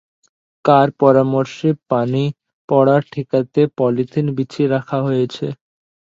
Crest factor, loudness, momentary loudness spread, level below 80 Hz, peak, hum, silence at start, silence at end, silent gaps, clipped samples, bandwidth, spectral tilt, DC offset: 18 dB; -17 LUFS; 8 LU; -60 dBFS; 0 dBFS; none; 0.65 s; 0.5 s; 2.53-2.68 s; under 0.1%; 7.6 kHz; -8.5 dB/octave; under 0.1%